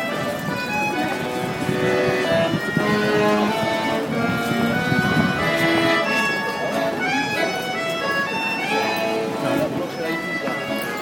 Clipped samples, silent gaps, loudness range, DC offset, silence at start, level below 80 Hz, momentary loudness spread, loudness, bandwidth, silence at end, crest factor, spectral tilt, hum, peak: under 0.1%; none; 3 LU; under 0.1%; 0 s; -52 dBFS; 6 LU; -21 LUFS; 16.5 kHz; 0 s; 16 dB; -5 dB/octave; none; -6 dBFS